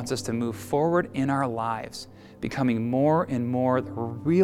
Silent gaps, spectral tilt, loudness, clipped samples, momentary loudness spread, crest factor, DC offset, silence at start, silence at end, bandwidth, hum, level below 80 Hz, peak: none; -6.5 dB/octave; -26 LUFS; under 0.1%; 10 LU; 16 dB; under 0.1%; 0 s; 0 s; 15 kHz; none; -56 dBFS; -10 dBFS